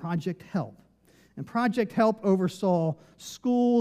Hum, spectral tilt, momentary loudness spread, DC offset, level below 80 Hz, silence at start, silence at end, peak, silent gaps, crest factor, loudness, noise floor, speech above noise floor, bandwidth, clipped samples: none; -7 dB/octave; 16 LU; under 0.1%; -70 dBFS; 0 s; 0 s; -10 dBFS; none; 16 dB; -27 LUFS; -61 dBFS; 35 dB; 14.5 kHz; under 0.1%